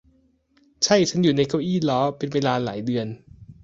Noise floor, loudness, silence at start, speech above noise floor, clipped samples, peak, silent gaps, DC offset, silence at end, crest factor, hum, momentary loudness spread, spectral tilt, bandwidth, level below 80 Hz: -62 dBFS; -22 LUFS; 0.8 s; 40 dB; under 0.1%; -4 dBFS; none; under 0.1%; 0.1 s; 20 dB; none; 9 LU; -5 dB/octave; 8 kHz; -58 dBFS